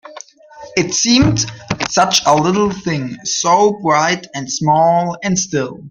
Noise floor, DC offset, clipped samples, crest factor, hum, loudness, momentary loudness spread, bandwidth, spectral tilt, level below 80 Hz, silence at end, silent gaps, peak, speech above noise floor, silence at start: -38 dBFS; under 0.1%; under 0.1%; 16 dB; none; -15 LUFS; 9 LU; 16 kHz; -3.5 dB/octave; -42 dBFS; 0 s; none; 0 dBFS; 23 dB; 0.05 s